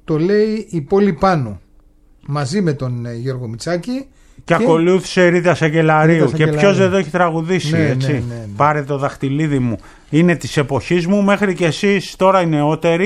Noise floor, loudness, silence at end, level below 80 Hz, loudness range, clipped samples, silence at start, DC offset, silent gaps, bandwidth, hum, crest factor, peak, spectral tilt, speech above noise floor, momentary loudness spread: -48 dBFS; -16 LUFS; 0 s; -44 dBFS; 6 LU; under 0.1%; 0.1 s; under 0.1%; none; 12 kHz; none; 14 dB; -2 dBFS; -6.5 dB/octave; 33 dB; 10 LU